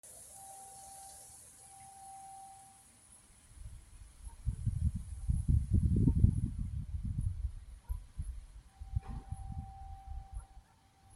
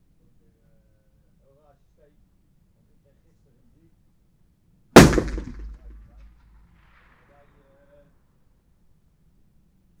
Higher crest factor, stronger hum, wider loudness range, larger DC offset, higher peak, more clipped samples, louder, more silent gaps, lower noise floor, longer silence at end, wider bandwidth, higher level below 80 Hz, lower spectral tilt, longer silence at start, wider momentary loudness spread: about the same, 26 dB vs 26 dB; neither; first, 18 LU vs 4 LU; neither; second, -12 dBFS vs 0 dBFS; neither; second, -37 LUFS vs -15 LUFS; neither; first, -65 dBFS vs -61 dBFS; second, 0 s vs 4.3 s; second, 13 kHz vs over 20 kHz; about the same, -42 dBFS vs -38 dBFS; first, -7.5 dB/octave vs -5 dB/octave; second, 0.05 s vs 4.95 s; second, 24 LU vs 30 LU